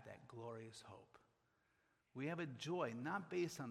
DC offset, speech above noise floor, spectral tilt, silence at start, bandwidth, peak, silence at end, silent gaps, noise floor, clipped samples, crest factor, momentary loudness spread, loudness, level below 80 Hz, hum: under 0.1%; 35 dB; -5.5 dB/octave; 0 s; 13.5 kHz; -30 dBFS; 0 s; none; -82 dBFS; under 0.1%; 20 dB; 15 LU; -47 LUFS; -86 dBFS; none